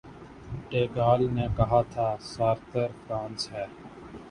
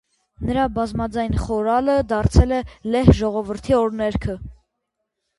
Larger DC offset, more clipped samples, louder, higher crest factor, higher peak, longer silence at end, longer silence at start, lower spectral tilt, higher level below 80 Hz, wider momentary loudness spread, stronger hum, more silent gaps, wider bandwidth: neither; neither; second, -28 LUFS vs -20 LUFS; about the same, 20 dB vs 20 dB; second, -8 dBFS vs 0 dBFS; second, 0 s vs 0.85 s; second, 0.05 s vs 0.4 s; about the same, -7 dB/octave vs -7.5 dB/octave; second, -46 dBFS vs -28 dBFS; first, 21 LU vs 10 LU; neither; neither; about the same, 11.5 kHz vs 11.5 kHz